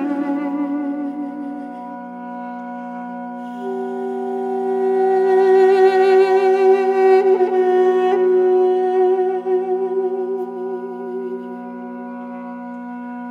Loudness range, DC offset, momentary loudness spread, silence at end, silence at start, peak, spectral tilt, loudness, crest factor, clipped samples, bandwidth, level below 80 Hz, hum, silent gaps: 14 LU; under 0.1%; 17 LU; 0 s; 0 s; -4 dBFS; -6.5 dB/octave; -17 LUFS; 14 dB; under 0.1%; 5.2 kHz; -76 dBFS; none; none